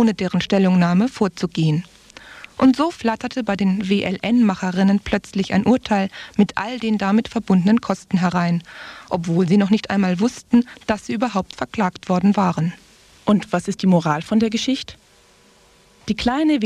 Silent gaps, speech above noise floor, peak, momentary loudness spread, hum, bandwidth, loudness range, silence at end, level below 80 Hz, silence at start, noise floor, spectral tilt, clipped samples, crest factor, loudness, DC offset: none; 34 dB; -4 dBFS; 9 LU; none; 10.5 kHz; 2 LU; 0 s; -50 dBFS; 0 s; -53 dBFS; -6.5 dB/octave; under 0.1%; 16 dB; -19 LUFS; under 0.1%